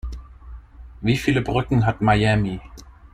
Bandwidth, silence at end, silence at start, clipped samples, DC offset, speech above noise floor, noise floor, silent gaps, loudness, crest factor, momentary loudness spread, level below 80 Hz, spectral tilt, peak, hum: 14 kHz; 0.2 s; 0.05 s; under 0.1%; under 0.1%; 21 dB; -40 dBFS; none; -20 LUFS; 16 dB; 17 LU; -36 dBFS; -7 dB/octave; -6 dBFS; none